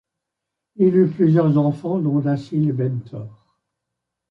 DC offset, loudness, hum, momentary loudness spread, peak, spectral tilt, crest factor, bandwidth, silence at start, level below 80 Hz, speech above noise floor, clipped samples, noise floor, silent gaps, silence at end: under 0.1%; -19 LUFS; none; 15 LU; -6 dBFS; -11 dB/octave; 14 dB; 5.6 kHz; 0.8 s; -64 dBFS; 64 dB; under 0.1%; -82 dBFS; none; 1 s